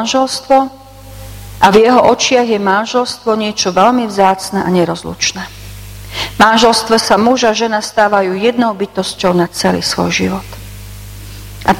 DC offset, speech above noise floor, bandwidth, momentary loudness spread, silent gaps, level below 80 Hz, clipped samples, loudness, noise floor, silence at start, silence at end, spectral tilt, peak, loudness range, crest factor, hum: under 0.1%; 20 dB; 17 kHz; 22 LU; none; -38 dBFS; 0.3%; -12 LUFS; -32 dBFS; 0 s; 0 s; -4 dB/octave; 0 dBFS; 3 LU; 12 dB; none